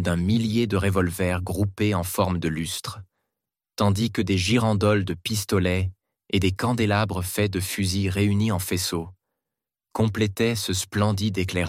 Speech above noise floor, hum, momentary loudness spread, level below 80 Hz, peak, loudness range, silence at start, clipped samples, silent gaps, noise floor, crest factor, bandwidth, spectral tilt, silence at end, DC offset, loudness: 64 dB; none; 6 LU; -48 dBFS; -6 dBFS; 2 LU; 0 s; under 0.1%; none; -87 dBFS; 18 dB; 16.5 kHz; -5.5 dB/octave; 0 s; under 0.1%; -24 LUFS